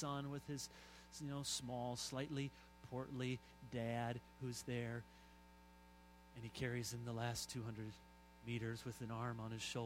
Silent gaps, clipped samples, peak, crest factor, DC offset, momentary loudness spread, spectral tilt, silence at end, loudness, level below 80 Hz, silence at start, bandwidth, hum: none; under 0.1%; -28 dBFS; 20 dB; under 0.1%; 20 LU; -4.5 dB/octave; 0 s; -47 LUFS; -68 dBFS; 0 s; 16 kHz; 60 Hz at -65 dBFS